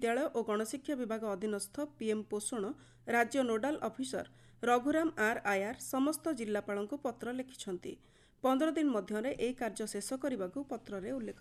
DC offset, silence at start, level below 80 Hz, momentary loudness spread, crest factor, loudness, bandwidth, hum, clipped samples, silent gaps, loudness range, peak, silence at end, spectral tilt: under 0.1%; 0 s; -68 dBFS; 11 LU; 18 dB; -36 LUFS; 13.5 kHz; none; under 0.1%; none; 3 LU; -16 dBFS; 0.05 s; -4 dB/octave